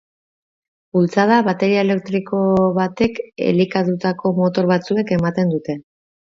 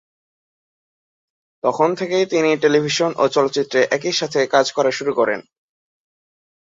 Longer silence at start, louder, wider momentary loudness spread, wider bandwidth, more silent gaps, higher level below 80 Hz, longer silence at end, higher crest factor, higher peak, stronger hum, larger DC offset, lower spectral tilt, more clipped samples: second, 0.95 s vs 1.65 s; about the same, -18 LUFS vs -18 LUFS; about the same, 6 LU vs 4 LU; about the same, 7.2 kHz vs 7.8 kHz; neither; first, -52 dBFS vs -66 dBFS; second, 0.4 s vs 1.25 s; about the same, 18 dB vs 18 dB; about the same, 0 dBFS vs -2 dBFS; neither; neither; first, -7.5 dB/octave vs -4 dB/octave; neither